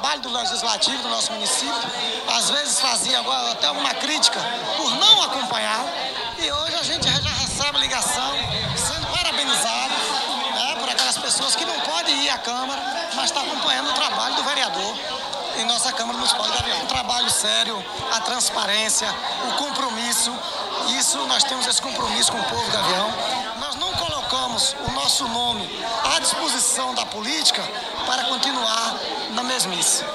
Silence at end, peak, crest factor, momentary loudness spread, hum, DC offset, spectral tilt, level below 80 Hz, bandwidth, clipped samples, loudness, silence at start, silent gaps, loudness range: 0 s; 0 dBFS; 22 dB; 6 LU; none; under 0.1%; -0.5 dB/octave; -50 dBFS; 16 kHz; under 0.1%; -20 LUFS; 0 s; none; 3 LU